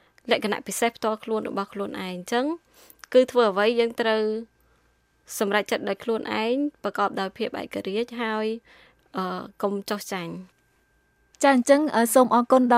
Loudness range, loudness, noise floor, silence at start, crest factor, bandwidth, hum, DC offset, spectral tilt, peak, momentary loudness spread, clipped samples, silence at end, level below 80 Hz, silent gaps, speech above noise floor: 6 LU; -24 LUFS; -65 dBFS; 0.25 s; 20 dB; 16 kHz; none; under 0.1%; -4 dB/octave; -6 dBFS; 13 LU; under 0.1%; 0 s; -68 dBFS; none; 42 dB